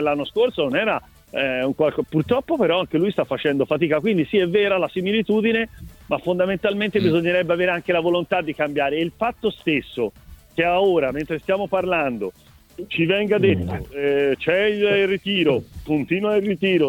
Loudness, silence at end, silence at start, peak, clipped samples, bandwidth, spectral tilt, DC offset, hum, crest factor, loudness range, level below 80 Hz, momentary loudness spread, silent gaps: -21 LUFS; 0 s; 0 s; -6 dBFS; under 0.1%; 16.5 kHz; -7 dB/octave; under 0.1%; none; 16 dB; 2 LU; -50 dBFS; 7 LU; none